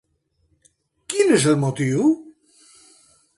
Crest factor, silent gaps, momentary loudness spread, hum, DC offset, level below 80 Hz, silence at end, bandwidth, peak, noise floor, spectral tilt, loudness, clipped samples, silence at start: 18 dB; none; 9 LU; none; under 0.1%; -62 dBFS; 1.1 s; 11.5 kHz; -6 dBFS; -67 dBFS; -5.5 dB/octave; -19 LUFS; under 0.1%; 1.1 s